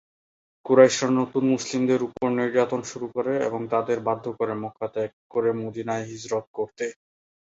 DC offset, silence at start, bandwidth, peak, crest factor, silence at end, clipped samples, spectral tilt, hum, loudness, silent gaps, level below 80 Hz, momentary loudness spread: under 0.1%; 0.65 s; 8 kHz; -2 dBFS; 22 dB; 0.65 s; under 0.1%; -5 dB/octave; none; -25 LUFS; 5.13-5.30 s, 6.47-6.54 s; -66 dBFS; 12 LU